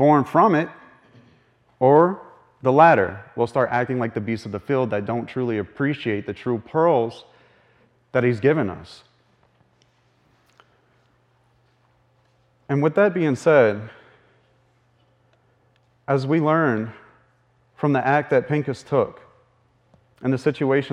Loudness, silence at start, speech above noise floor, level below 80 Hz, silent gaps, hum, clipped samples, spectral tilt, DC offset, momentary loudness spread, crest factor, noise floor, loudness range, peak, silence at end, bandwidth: -21 LUFS; 0 s; 42 dB; -64 dBFS; none; none; under 0.1%; -8 dB/octave; under 0.1%; 12 LU; 22 dB; -62 dBFS; 7 LU; -2 dBFS; 0 s; 10.5 kHz